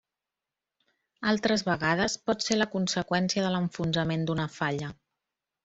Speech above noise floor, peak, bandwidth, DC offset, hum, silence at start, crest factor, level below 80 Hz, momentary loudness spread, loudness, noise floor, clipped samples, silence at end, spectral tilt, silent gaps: 61 dB; -8 dBFS; 8.2 kHz; under 0.1%; none; 1.2 s; 20 dB; -60 dBFS; 5 LU; -28 LUFS; -89 dBFS; under 0.1%; 0.7 s; -4.5 dB/octave; none